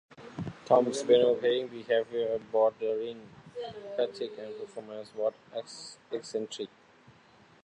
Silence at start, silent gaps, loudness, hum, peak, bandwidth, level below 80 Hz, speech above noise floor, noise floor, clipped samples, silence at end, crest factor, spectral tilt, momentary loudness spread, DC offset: 0.2 s; none; -30 LUFS; none; -10 dBFS; 10.5 kHz; -70 dBFS; 29 dB; -59 dBFS; under 0.1%; 0.95 s; 22 dB; -4.5 dB/octave; 17 LU; under 0.1%